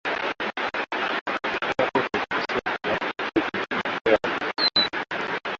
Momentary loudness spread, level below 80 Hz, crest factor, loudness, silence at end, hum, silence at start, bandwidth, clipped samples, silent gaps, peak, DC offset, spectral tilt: 6 LU; -58 dBFS; 20 dB; -25 LUFS; 0.05 s; none; 0.05 s; 7.8 kHz; under 0.1%; 1.21-1.26 s, 4.01-4.05 s; -6 dBFS; under 0.1%; -4 dB/octave